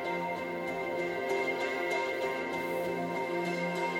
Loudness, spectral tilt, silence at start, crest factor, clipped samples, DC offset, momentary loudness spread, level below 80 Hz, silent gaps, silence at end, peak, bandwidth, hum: -33 LUFS; -5 dB/octave; 0 s; 14 dB; under 0.1%; under 0.1%; 3 LU; -70 dBFS; none; 0 s; -18 dBFS; 16.5 kHz; none